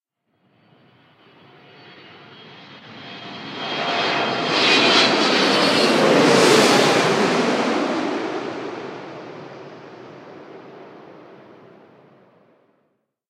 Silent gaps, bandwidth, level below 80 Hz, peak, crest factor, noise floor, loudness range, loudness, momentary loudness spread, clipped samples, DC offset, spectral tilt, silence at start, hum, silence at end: none; 16 kHz; -70 dBFS; -2 dBFS; 20 dB; -69 dBFS; 19 LU; -17 LUFS; 27 LU; under 0.1%; under 0.1%; -3.5 dB/octave; 2.45 s; none; 2.15 s